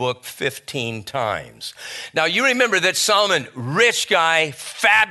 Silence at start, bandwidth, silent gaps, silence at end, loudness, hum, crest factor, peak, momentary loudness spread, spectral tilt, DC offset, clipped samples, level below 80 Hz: 0 s; 12.5 kHz; none; 0 s; -18 LUFS; none; 20 dB; 0 dBFS; 11 LU; -2 dB/octave; under 0.1%; under 0.1%; -62 dBFS